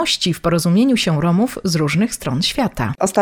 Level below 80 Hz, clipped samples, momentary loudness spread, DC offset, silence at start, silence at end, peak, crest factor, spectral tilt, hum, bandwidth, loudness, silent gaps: -42 dBFS; under 0.1%; 5 LU; under 0.1%; 0 s; 0 s; -2 dBFS; 16 dB; -5 dB/octave; none; 17.5 kHz; -17 LUFS; none